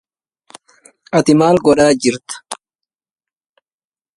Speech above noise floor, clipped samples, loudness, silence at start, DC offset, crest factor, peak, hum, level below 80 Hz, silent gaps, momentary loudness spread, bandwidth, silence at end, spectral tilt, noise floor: over 78 dB; under 0.1%; -13 LUFS; 1.15 s; under 0.1%; 18 dB; 0 dBFS; none; -52 dBFS; none; 18 LU; 11.5 kHz; 1.6 s; -5 dB/octave; under -90 dBFS